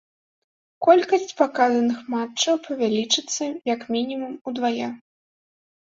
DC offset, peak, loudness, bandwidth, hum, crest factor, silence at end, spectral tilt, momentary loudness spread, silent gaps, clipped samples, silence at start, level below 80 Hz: under 0.1%; -4 dBFS; -22 LUFS; 7.8 kHz; none; 20 dB; 0.9 s; -2.5 dB/octave; 11 LU; 4.41-4.45 s; under 0.1%; 0.8 s; -72 dBFS